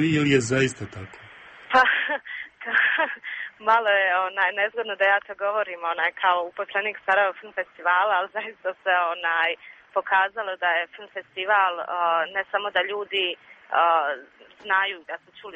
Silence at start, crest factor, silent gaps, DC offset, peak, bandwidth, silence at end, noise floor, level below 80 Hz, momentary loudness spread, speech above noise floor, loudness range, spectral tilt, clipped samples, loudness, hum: 0 s; 18 dB; none; under 0.1%; -6 dBFS; 8.4 kHz; 0 s; -43 dBFS; -66 dBFS; 13 LU; 19 dB; 2 LU; -4 dB/octave; under 0.1%; -23 LUFS; none